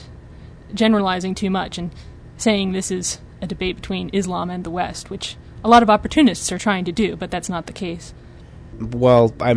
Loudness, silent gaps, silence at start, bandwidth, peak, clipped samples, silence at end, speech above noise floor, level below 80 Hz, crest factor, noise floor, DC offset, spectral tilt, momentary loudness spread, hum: -20 LUFS; none; 0 s; 11 kHz; -2 dBFS; under 0.1%; 0 s; 21 dB; -42 dBFS; 18 dB; -40 dBFS; under 0.1%; -5 dB/octave; 16 LU; none